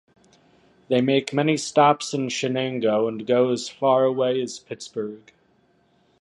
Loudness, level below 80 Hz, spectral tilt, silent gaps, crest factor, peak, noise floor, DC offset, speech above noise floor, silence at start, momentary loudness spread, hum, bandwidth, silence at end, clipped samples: -22 LUFS; -70 dBFS; -5 dB/octave; none; 20 dB; -4 dBFS; -62 dBFS; under 0.1%; 40 dB; 0.9 s; 13 LU; none; 11.5 kHz; 1.05 s; under 0.1%